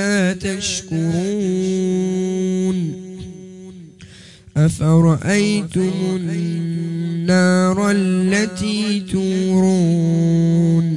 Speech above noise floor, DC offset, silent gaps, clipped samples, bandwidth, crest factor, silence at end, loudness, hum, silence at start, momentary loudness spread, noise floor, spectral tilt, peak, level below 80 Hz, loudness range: 26 dB; under 0.1%; none; under 0.1%; 11.5 kHz; 14 dB; 0 s; -18 LUFS; none; 0 s; 9 LU; -42 dBFS; -6 dB/octave; -4 dBFS; -50 dBFS; 5 LU